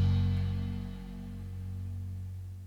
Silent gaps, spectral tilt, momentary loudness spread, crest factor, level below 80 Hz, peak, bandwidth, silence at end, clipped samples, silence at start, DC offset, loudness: none; -8.5 dB/octave; 13 LU; 14 dB; -44 dBFS; -18 dBFS; 6 kHz; 0 s; under 0.1%; 0 s; under 0.1%; -36 LUFS